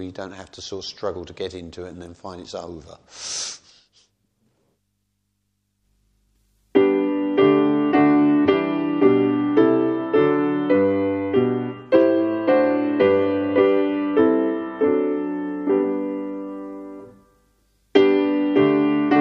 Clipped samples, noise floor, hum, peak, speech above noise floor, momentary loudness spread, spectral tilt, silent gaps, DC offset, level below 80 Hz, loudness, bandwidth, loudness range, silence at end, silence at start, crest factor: under 0.1%; -72 dBFS; 50 Hz at -60 dBFS; -2 dBFS; 39 dB; 18 LU; -6 dB/octave; none; under 0.1%; -62 dBFS; -19 LUFS; 9.4 kHz; 16 LU; 0 s; 0 s; 20 dB